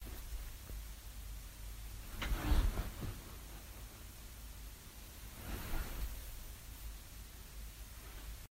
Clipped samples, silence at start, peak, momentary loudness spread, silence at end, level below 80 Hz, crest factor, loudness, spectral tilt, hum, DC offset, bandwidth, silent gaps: under 0.1%; 0 s; -20 dBFS; 12 LU; 0.05 s; -44 dBFS; 22 dB; -46 LUFS; -4.5 dB/octave; none; under 0.1%; 16 kHz; none